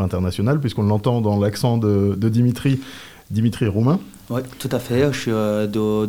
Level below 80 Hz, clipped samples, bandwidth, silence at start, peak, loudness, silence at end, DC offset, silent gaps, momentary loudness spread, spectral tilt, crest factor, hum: -50 dBFS; under 0.1%; 17 kHz; 0 s; -6 dBFS; -20 LUFS; 0 s; 0.3%; none; 8 LU; -7.5 dB/octave; 14 dB; none